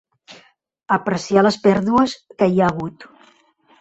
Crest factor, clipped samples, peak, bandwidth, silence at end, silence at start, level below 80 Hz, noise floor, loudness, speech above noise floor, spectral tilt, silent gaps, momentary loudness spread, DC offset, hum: 18 dB; under 0.1%; -2 dBFS; 8.2 kHz; 0.75 s; 0.3 s; -54 dBFS; -56 dBFS; -18 LUFS; 38 dB; -6.5 dB/octave; none; 7 LU; under 0.1%; none